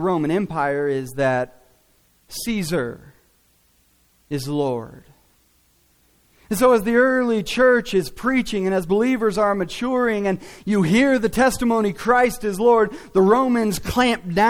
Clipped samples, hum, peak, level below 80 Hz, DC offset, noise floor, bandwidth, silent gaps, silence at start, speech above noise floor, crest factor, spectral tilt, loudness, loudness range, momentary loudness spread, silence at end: under 0.1%; none; -4 dBFS; -46 dBFS; under 0.1%; -60 dBFS; 17.5 kHz; none; 0 s; 41 dB; 16 dB; -5.5 dB/octave; -20 LUFS; 11 LU; 9 LU; 0 s